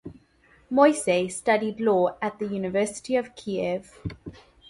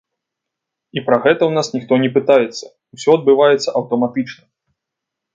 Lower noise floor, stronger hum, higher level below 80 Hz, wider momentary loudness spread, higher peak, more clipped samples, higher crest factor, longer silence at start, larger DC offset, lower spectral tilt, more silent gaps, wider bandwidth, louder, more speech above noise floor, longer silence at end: second, -59 dBFS vs -81 dBFS; neither; first, -56 dBFS vs -64 dBFS; first, 18 LU vs 12 LU; second, -6 dBFS vs 0 dBFS; neither; about the same, 20 dB vs 16 dB; second, 0.05 s vs 0.95 s; neither; about the same, -5 dB/octave vs -5.5 dB/octave; neither; first, 11.5 kHz vs 7.8 kHz; second, -25 LUFS vs -15 LUFS; second, 35 dB vs 66 dB; second, 0.4 s vs 1 s